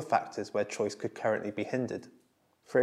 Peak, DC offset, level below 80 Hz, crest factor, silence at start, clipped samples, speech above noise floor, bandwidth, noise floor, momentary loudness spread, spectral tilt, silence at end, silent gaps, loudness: -12 dBFS; under 0.1%; -82 dBFS; 22 dB; 0 s; under 0.1%; 30 dB; 13 kHz; -63 dBFS; 4 LU; -5.5 dB/octave; 0 s; none; -33 LUFS